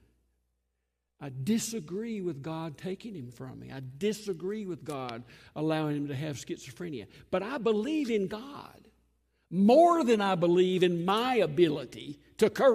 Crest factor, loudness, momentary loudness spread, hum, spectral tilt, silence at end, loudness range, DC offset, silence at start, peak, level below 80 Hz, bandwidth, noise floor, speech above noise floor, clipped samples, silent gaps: 18 dB; -29 LUFS; 19 LU; none; -6 dB/octave; 0 s; 11 LU; under 0.1%; 1.2 s; -12 dBFS; -68 dBFS; 15.5 kHz; -82 dBFS; 53 dB; under 0.1%; none